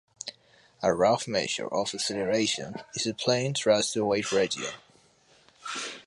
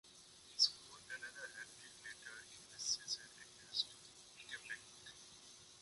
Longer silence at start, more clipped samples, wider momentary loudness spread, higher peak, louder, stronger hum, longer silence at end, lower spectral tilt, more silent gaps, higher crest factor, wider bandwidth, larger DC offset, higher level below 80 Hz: first, 0.25 s vs 0.05 s; neither; second, 13 LU vs 22 LU; first, -10 dBFS vs -20 dBFS; first, -27 LUFS vs -43 LUFS; neither; about the same, 0.05 s vs 0 s; first, -3.5 dB/octave vs 1.5 dB/octave; neither; second, 20 dB vs 28 dB; about the same, 11.5 kHz vs 11.5 kHz; neither; first, -64 dBFS vs -82 dBFS